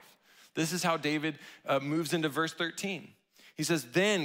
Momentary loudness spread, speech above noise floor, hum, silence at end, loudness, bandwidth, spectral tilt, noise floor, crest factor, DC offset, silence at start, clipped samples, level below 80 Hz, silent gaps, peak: 10 LU; 29 dB; none; 0 s; -32 LUFS; 16 kHz; -4 dB/octave; -60 dBFS; 20 dB; under 0.1%; 0.55 s; under 0.1%; -82 dBFS; none; -14 dBFS